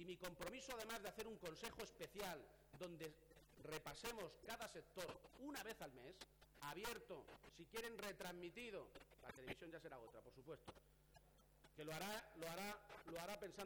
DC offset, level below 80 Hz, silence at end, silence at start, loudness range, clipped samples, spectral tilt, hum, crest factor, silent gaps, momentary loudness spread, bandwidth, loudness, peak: under 0.1%; -74 dBFS; 0 s; 0 s; 3 LU; under 0.1%; -3.5 dB/octave; none; 20 dB; none; 11 LU; over 20 kHz; -54 LUFS; -34 dBFS